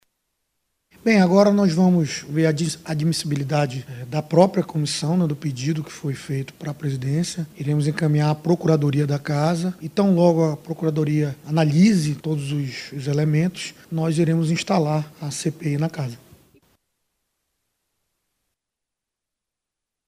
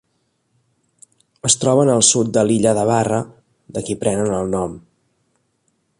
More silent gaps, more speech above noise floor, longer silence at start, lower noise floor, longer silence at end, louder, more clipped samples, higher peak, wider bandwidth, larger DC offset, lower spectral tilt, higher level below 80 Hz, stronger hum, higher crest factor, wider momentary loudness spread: neither; first, 64 dB vs 51 dB; second, 1.05 s vs 1.45 s; first, -85 dBFS vs -67 dBFS; first, 3.9 s vs 1.2 s; second, -21 LUFS vs -17 LUFS; neither; about the same, -2 dBFS vs 0 dBFS; first, 15 kHz vs 11.5 kHz; neither; first, -6.5 dB/octave vs -4 dB/octave; second, -60 dBFS vs -50 dBFS; neither; about the same, 20 dB vs 18 dB; second, 11 LU vs 14 LU